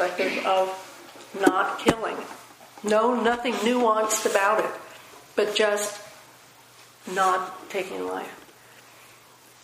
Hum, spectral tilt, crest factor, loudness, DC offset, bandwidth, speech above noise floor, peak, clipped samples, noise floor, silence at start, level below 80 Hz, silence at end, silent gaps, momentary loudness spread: none; -3 dB/octave; 24 dB; -24 LUFS; under 0.1%; 15.5 kHz; 28 dB; -2 dBFS; under 0.1%; -52 dBFS; 0 s; -60 dBFS; 1.2 s; none; 19 LU